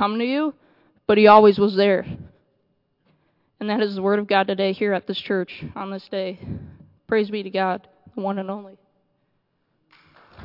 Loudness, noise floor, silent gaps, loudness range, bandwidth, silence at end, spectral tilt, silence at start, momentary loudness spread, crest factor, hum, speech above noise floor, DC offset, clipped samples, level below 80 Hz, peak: -20 LUFS; -70 dBFS; none; 9 LU; 5.8 kHz; 0 s; -8.5 dB/octave; 0 s; 18 LU; 22 dB; none; 50 dB; under 0.1%; under 0.1%; -60 dBFS; 0 dBFS